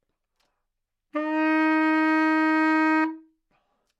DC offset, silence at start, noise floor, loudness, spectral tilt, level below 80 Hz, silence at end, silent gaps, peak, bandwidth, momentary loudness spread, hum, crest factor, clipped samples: under 0.1%; 1.15 s; -80 dBFS; -22 LUFS; -4 dB/octave; -82 dBFS; 0.8 s; none; -12 dBFS; 7.6 kHz; 8 LU; none; 14 dB; under 0.1%